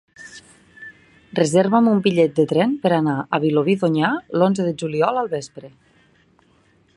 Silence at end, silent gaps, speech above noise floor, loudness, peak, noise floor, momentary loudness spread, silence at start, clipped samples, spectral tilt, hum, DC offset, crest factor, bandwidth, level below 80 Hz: 1.3 s; none; 39 dB; -19 LUFS; -2 dBFS; -58 dBFS; 24 LU; 0.2 s; under 0.1%; -6.5 dB/octave; none; under 0.1%; 18 dB; 11.5 kHz; -64 dBFS